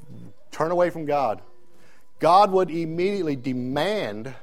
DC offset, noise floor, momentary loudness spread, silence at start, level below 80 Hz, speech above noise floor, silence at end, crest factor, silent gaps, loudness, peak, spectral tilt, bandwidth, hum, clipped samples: 1%; -58 dBFS; 11 LU; 0.1 s; -62 dBFS; 36 dB; 0.05 s; 18 dB; none; -23 LUFS; -6 dBFS; -6 dB/octave; 15.5 kHz; none; under 0.1%